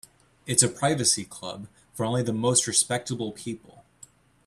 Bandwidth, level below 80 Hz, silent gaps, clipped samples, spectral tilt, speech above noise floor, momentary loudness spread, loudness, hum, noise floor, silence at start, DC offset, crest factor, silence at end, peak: 14.5 kHz; -62 dBFS; none; under 0.1%; -3 dB/octave; 28 dB; 19 LU; -24 LUFS; none; -54 dBFS; 0.45 s; under 0.1%; 24 dB; 0.65 s; -4 dBFS